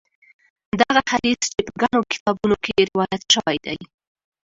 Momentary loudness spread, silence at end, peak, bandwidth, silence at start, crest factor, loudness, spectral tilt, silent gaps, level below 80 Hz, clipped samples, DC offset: 8 LU; 0.65 s; 0 dBFS; 8 kHz; 0.75 s; 22 dB; -20 LUFS; -3 dB/octave; 2.20-2.26 s; -52 dBFS; under 0.1%; under 0.1%